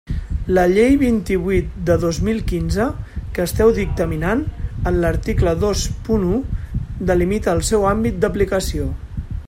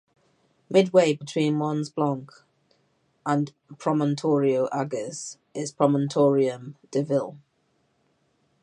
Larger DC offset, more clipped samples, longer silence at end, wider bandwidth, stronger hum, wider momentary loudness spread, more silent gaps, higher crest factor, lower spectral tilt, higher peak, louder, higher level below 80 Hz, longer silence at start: neither; neither; second, 0 s vs 1.25 s; first, 16.5 kHz vs 11 kHz; neither; about the same, 11 LU vs 13 LU; neither; about the same, 16 dB vs 20 dB; about the same, -6 dB/octave vs -6.5 dB/octave; about the same, -2 dBFS vs -4 dBFS; first, -19 LUFS vs -25 LUFS; first, -28 dBFS vs -76 dBFS; second, 0.05 s vs 0.7 s